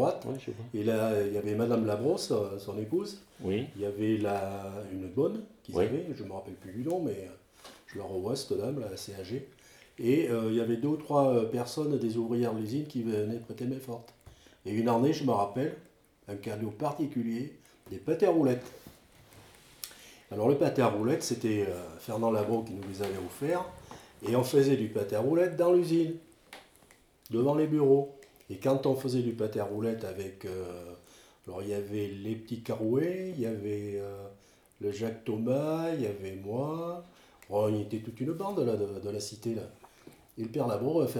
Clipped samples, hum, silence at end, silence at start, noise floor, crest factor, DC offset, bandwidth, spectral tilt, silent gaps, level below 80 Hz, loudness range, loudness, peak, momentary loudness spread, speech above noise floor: under 0.1%; none; 0 s; 0 s; -61 dBFS; 20 dB; under 0.1%; 19 kHz; -6.5 dB/octave; none; -68 dBFS; 6 LU; -31 LUFS; -12 dBFS; 16 LU; 31 dB